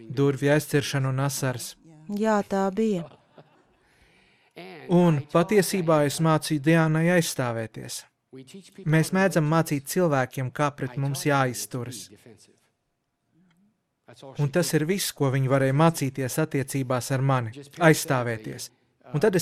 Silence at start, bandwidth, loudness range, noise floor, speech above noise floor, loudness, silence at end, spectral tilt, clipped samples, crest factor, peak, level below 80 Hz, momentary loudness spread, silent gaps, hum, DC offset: 0 s; 16 kHz; 7 LU; -77 dBFS; 53 dB; -24 LUFS; 0 s; -5.5 dB/octave; under 0.1%; 22 dB; -4 dBFS; -62 dBFS; 15 LU; none; none; under 0.1%